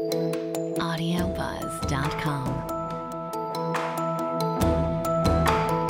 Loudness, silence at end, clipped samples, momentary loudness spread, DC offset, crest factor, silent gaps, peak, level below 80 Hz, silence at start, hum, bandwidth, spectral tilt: -27 LUFS; 0 s; under 0.1%; 8 LU; under 0.1%; 18 dB; none; -8 dBFS; -40 dBFS; 0 s; none; 17 kHz; -6 dB/octave